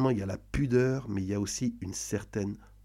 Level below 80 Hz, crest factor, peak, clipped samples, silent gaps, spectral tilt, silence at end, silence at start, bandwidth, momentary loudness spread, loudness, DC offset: -48 dBFS; 16 dB; -14 dBFS; under 0.1%; none; -6 dB/octave; 0.2 s; 0 s; 16 kHz; 9 LU; -31 LUFS; under 0.1%